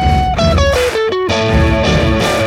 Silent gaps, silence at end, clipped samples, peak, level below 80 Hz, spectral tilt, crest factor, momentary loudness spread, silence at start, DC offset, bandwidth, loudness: none; 0 s; under 0.1%; 0 dBFS; -20 dBFS; -5.5 dB/octave; 12 dB; 3 LU; 0 s; under 0.1%; 15.5 kHz; -13 LUFS